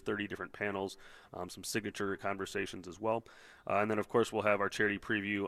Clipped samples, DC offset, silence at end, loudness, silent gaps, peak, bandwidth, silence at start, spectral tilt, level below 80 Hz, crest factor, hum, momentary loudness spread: under 0.1%; under 0.1%; 0 s; -35 LUFS; none; -14 dBFS; 14.5 kHz; 0.05 s; -4.5 dB/octave; -66 dBFS; 22 dB; none; 12 LU